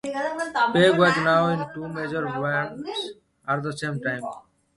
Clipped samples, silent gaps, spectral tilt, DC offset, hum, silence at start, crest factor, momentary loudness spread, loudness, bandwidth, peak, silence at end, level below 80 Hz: under 0.1%; none; -5.5 dB/octave; under 0.1%; none; 0.05 s; 20 dB; 14 LU; -24 LUFS; 11.5 kHz; -4 dBFS; 0.35 s; -60 dBFS